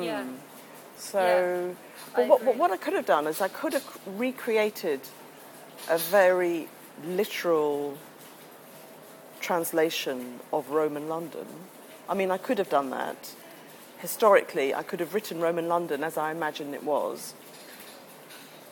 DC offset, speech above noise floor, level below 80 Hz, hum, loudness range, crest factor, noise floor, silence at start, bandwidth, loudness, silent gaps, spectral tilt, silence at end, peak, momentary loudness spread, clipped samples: under 0.1%; 21 dB; -82 dBFS; none; 5 LU; 22 dB; -48 dBFS; 0 s; 19 kHz; -27 LUFS; none; -4 dB/octave; 0 s; -6 dBFS; 24 LU; under 0.1%